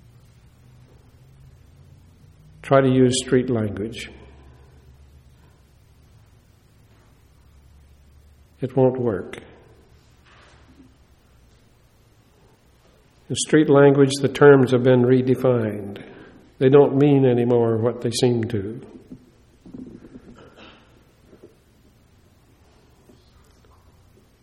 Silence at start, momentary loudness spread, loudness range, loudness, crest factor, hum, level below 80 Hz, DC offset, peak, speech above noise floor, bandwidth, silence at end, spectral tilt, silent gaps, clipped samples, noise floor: 2.65 s; 25 LU; 13 LU; -18 LUFS; 22 dB; none; -54 dBFS; under 0.1%; -2 dBFS; 38 dB; 12.5 kHz; 4.55 s; -6.5 dB/octave; none; under 0.1%; -56 dBFS